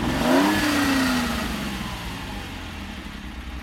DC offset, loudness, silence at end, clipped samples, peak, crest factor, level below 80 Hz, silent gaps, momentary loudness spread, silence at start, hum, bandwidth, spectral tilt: under 0.1%; -23 LUFS; 0 s; under 0.1%; -6 dBFS; 18 dB; -38 dBFS; none; 16 LU; 0 s; none; 16.5 kHz; -4.5 dB/octave